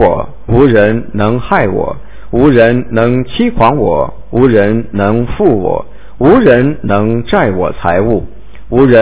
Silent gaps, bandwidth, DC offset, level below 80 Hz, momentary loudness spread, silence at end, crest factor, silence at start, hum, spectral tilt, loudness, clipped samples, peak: none; 4 kHz; 8%; -28 dBFS; 9 LU; 0 s; 10 dB; 0 s; none; -11.5 dB/octave; -11 LUFS; 3%; 0 dBFS